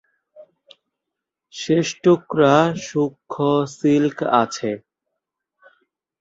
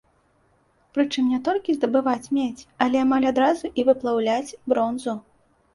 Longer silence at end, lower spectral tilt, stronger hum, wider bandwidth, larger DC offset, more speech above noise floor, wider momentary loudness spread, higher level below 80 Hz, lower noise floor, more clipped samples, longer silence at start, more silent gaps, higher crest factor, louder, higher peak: first, 1.4 s vs 0.55 s; first, -6 dB/octave vs -4.5 dB/octave; neither; second, 8 kHz vs 11.5 kHz; neither; first, 65 dB vs 41 dB; first, 12 LU vs 8 LU; about the same, -62 dBFS vs -62 dBFS; first, -83 dBFS vs -63 dBFS; neither; second, 0.4 s vs 0.95 s; neither; about the same, 20 dB vs 18 dB; first, -19 LUFS vs -23 LUFS; about the same, -2 dBFS vs -4 dBFS